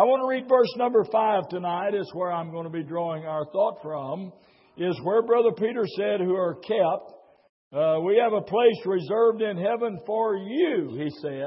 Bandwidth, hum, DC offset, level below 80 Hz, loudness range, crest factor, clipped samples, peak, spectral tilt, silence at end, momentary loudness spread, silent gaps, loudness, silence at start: 5.8 kHz; none; under 0.1%; -74 dBFS; 5 LU; 18 dB; under 0.1%; -6 dBFS; -10.5 dB/octave; 0 s; 10 LU; 7.49-7.71 s; -25 LUFS; 0 s